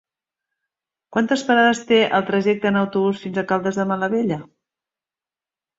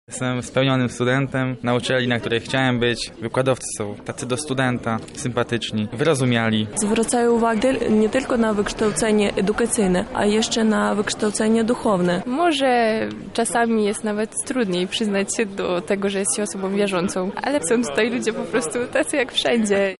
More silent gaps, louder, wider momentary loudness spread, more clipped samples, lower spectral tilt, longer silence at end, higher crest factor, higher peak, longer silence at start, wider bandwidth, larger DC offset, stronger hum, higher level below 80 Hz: neither; about the same, -19 LUFS vs -21 LUFS; about the same, 8 LU vs 6 LU; neither; about the same, -5.5 dB/octave vs -4.5 dB/octave; first, 1.35 s vs 0.05 s; about the same, 18 dB vs 14 dB; first, -4 dBFS vs -8 dBFS; first, 1.1 s vs 0.1 s; second, 8 kHz vs 11.5 kHz; neither; neither; second, -64 dBFS vs -48 dBFS